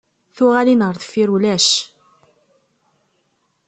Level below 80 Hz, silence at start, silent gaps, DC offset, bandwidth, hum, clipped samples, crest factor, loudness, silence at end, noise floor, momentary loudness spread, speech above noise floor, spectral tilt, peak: -62 dBFS; 0.35 s; none; under 0.1%; 8.8 kHz; none; under 0.1%; 16 dB; -15 LUFS; 1.85 s; -65 dBFS; 6 LU; 50 dB; -3.5 dB/octave; -2 dBFS